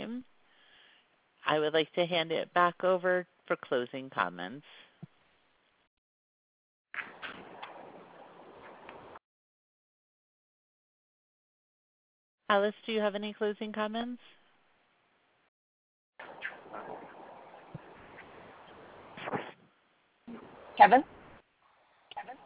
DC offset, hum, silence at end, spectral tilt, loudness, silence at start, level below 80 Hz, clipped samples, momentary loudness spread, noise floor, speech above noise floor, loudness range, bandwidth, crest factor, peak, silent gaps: under 0.1%; none; 0.1 s; -2 dB/octave; -31 LUFS; 0 s; -78 dBFS; under 0.1%; 24 LU; -71 dBFS; 42 dB; 18 LU; 4 kHz; 28 dB; -8 dBFS; 5.87-6.85 s, 9.24-12.38 s, 15.48-16.13 s